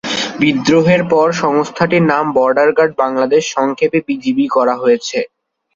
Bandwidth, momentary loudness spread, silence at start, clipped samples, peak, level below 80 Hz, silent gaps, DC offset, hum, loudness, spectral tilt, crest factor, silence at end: 7.8 kHz; 6 LU; 0.05 s; under 0.1%; 0 dBFS; -54 dBFS; none; under 0.1%; none; -14 LUFS; -5.5 dB/octave; 12 dB; 0.5 s